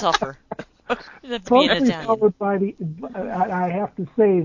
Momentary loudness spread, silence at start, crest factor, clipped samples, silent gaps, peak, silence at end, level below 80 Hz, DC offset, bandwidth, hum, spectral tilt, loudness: 14 LU; 0 s; 20 dB; under 0.1%; none; 0 dBFS; 0 s; -54 dBFS; under 0.1%; 7.4 kHz; none; -5.5 dB/octave; -22 LUFS